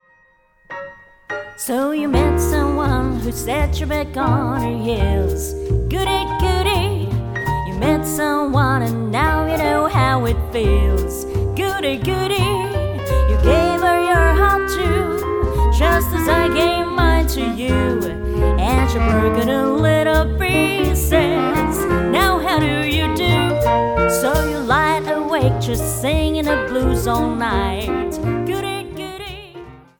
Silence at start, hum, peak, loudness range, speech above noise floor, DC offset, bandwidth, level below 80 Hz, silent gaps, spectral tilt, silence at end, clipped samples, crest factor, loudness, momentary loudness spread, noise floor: 0.7 s; none; -2 dBFS; 3 LU; 38 dB; under 0.1%; 19 kHz; -24 dBFS; none; -5.5 dB/octave; 0.2 s; under 0.1%; 16 dB; -18 LUFS; 7 LU; -55 dBFS